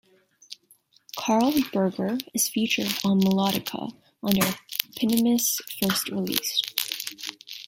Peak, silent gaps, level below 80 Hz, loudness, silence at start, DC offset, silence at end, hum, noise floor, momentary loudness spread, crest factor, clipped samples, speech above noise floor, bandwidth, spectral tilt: 0 dBFS; none; -62 dBFS; -25 LUFS; 0.5 s; under 0.1%; 0.05 s; none; -61 dBFS; 14 LU; 26 dB; under 0.1%; 36 dB; 17 kHz; -3.5 dB/octave